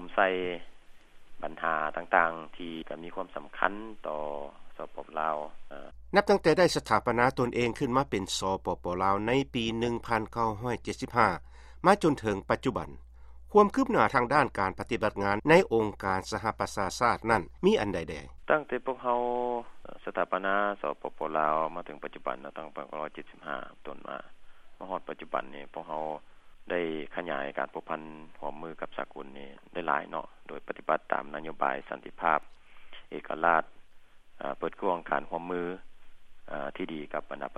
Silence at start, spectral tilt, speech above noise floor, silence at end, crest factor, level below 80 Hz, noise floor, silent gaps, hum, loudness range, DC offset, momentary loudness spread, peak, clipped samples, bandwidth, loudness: 0 s; -5 dB/octave; 20 dB; 0 s; 26 dB; -54 dBFS; -50 dBFS; none; none; 10 LU; under 0.1%; 17 LU; -6 dBFS; under 0.1%; 14 kHz; -30 LUFS